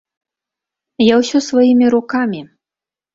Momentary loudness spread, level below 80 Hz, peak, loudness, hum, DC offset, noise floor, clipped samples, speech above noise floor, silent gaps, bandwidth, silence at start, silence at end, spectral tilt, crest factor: 9 LU; -58 dBFS; -2 dBFS; -13 LUFS; none; under 0.1%; -89 dBFS; under 0.1%; 76 dB; none; 7.8 kHz; 1 s; 0.7 s; -5 dB/octave; 14 dB